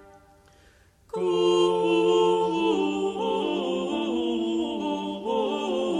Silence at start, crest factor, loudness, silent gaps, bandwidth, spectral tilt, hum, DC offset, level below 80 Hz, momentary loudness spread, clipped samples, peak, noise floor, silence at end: 1.15 s; 14 dB; -25 LUFS; none; 10.5 kHz; -5.5 dB/octave; none; under 0.1%; -62 dBFS; 7 LU; under 0.1%; -12 dBFS; -57 dBFS; 0 s